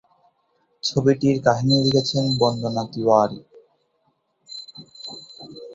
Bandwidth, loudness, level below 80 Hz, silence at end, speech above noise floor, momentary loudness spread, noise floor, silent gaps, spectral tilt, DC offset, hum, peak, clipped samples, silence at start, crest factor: 7.8 kHz; -20 LUFS; -56 dBFS; 0 s; 49 dB; 20 LU; -68 dBFS; none; -6 dB/octave; under 0.1%; none; -2 dBFS; under 0.1%; 0.85 s; 20 dB